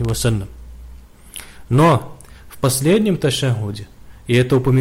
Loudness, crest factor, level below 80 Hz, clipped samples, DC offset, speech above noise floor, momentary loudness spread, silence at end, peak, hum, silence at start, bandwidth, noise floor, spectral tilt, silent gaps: -17 LUFS; 12 dB; -38 dBFS; under 0.1%; under 0.1%; 24 dB; 20 LU; 0 s; -6 dBFS; none; 0 s; 16 kHz; -40 dBFS; -5.5 dB/octave; none